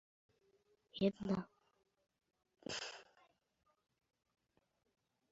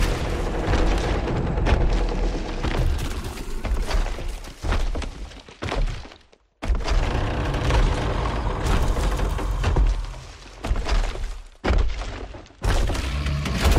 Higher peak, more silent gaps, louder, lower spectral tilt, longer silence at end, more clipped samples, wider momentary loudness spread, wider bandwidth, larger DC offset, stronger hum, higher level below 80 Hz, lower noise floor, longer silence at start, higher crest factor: second, -22 dBFS vs -6 dBFS; neither; second, -42 LUFS vs -26 LUFS; about the same, -5 dB/octave vs -5.5 dB/octave; first, 2.3 s vs 0 s; neither; first, 18 LU vs 12 LU; second, 7.6 kHz vs 14.5 kHz; neither; neither; second, -76 dBFS vs -24 dBFS; first, -77 dBFS vs -52 dBFS; first, 0.95 s vs 0 s; first, 26 dB vs 16 dB